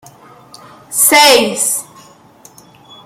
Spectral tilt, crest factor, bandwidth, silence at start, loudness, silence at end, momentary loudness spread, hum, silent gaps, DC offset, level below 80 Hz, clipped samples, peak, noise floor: -0.5 dB/octave; 16 dB; over 20 kHz; 0.9 s; -9 LUFS; 1.25 s; 13 LU; none; none; under 0.1%; -60 dBFS; under 0.1%; 0 dBFS; -43 dBFS